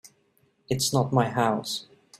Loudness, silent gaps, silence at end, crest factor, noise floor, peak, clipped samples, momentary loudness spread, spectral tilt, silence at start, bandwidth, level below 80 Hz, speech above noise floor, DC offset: -26 LUFS; none; 0.35 s; 18 dB; -67 dBFS; -8 dBFS; under 0.1%; 10 LU; -4.5 dB/octave; 0.05 s; 16 kHz; -62 dBFS; 42 dB; under 0.1%